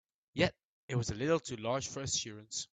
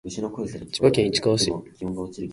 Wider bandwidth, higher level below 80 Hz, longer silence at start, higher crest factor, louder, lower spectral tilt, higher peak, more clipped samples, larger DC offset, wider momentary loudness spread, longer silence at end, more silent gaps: second, 9.2 kHz vs 11.5 kHz; second, -62 dBFS vs -50 dBFS; first, 0.35 s vs 0.05 s; about the same, 22 dB vs 20 dB; second, -35 LUFS vs -24 LUFS; about the same, -4 dB/octave vs -4.5 dB/octave; second, -14 dBFS vs -4 dBFS; neither; neither; second, 7 LU vs 12 LU; about the same, 0.1 s vs 0 s; first, 0.64-0.88 s vs none